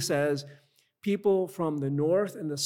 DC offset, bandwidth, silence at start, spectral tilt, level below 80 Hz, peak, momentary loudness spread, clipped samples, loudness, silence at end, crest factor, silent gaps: under 0.1%; 17.5 kHz; 0 s; -5 dB/octave; -76 dBFS; -14 dBFS; 9 LU; under 0.1%; -29 LUFS; 0 s; 14 dB; none